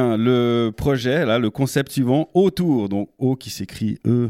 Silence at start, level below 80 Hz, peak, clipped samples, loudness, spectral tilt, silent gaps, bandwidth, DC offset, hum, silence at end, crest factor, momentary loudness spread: 0 s; -46 dBFS; -4 dBFS; under 0.1%; -20 LUFS; -6.5 dB/octave; none; 16 kHz; under 0.1%; none; 0 s; 14 dB; 8 LU